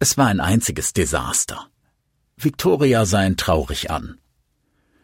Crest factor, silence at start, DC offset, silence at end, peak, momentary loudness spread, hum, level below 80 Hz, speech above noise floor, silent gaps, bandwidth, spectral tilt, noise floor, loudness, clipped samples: 18 dB; 0 s; under 0.1%; 0.9 s; -2 dBFS; 10 LU; none; -40 dBFS; 49 dB; none; 16.5 kHz; -4 dB/octave; -68 dBFS; -19 LUFS; under 0.1%